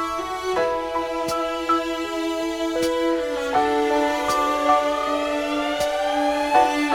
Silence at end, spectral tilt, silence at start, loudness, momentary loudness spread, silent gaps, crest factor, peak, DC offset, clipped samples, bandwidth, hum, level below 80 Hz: 0 s; -3 dB/octave; 0 s; -22 LUFS; 6 LU; none; 18 dB; -4 dBFS; under 0.1%; under 0.1%; 19 kHz; none; -50 dBFS